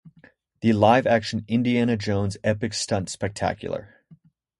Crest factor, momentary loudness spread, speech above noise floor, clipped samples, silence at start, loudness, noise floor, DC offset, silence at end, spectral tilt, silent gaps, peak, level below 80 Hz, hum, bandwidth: 20 dB; 11 LU; 34 dB; under 0.1%; 0.05 s; -23 LUFS; -56 dBFS; under 0.1%; 0.45 s; -5.5 dB/octave; none; -4 dBFS; -50 dBFS; none; 11.5 kHz